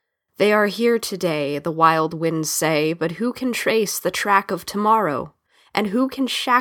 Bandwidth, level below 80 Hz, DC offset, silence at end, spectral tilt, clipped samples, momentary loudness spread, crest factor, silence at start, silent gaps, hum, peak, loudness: 19 kHz; -62 dBFS; under 0.1%; 0 s; -4 dB/octave; under 0.1%; 7 LU; 20 dB; 0.4 s; none; none; 0 dBFS; -20 LUFS